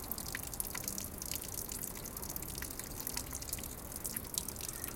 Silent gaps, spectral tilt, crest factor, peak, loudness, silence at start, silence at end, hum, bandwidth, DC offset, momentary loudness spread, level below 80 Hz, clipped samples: none; -2.5 dB/octave; 34 dB; -8 dBFS; -40 LUFS; 0 s; 0 s; none; 17 kHz; under 0.1%; 3 LU; -52 dBFS; under 0.1%